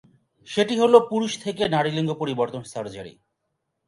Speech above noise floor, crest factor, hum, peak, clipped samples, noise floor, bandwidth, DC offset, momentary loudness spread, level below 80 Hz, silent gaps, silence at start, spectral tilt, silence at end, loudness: 55 dB; 22 dB; none; -2 dBFS; under 0.1%; -77 dBFS; 11.5 kHz; under 0.1%; 17 LU; -64 dBFS; none; 0.5 s; -5.5 dB/octave; 0.75 s; -22 LUFS